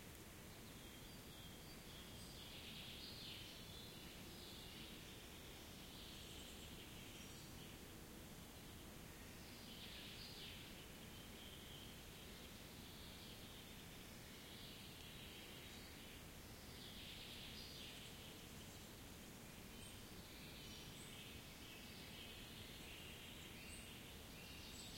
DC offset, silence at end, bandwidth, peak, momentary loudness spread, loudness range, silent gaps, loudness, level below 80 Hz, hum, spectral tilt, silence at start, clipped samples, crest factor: under 0.1%; 0 s; 16.5 kHz; -40 dBFS; 4 LU; 2 LU; none; -56 LUFS; -66 dBFS; none; -3 dB/octave; 0 s; under 0.1%; 16 dB